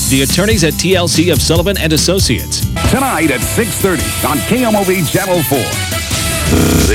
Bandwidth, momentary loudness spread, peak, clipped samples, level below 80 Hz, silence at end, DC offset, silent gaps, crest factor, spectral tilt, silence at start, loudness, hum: 19.5 kHz; 4 LU; 0 dBFS; under 0.1%; -24 dBFS; 0 s; under 0.1%; none; 12 dB; -4 dB/octave; 0 s; -12 LUFS; none